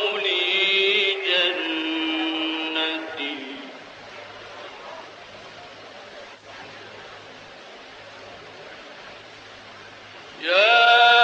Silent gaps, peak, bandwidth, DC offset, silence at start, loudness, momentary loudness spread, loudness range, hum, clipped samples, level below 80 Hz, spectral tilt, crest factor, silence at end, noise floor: none; -6 dBFS; 8.4 kHz; under 0.1%; 0 s; -20 LUFS; 24 LU; 19 LU; none; under 0.1%; -70 dBFS; -2 dB/octave; 18 dB; 0 s; -43 dBFS